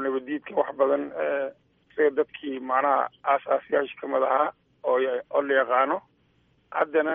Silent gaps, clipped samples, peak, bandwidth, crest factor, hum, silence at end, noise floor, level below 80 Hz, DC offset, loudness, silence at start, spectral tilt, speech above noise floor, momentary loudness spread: none; under 0.1%; -8 dBFS; 3.7 kHz; 18 dB; none; 0 s; -65 dBFS; -74 dBFS; under 0.1%; -26 LUFS; 0 s; -2 dB/octave; 40 dB; 8 LU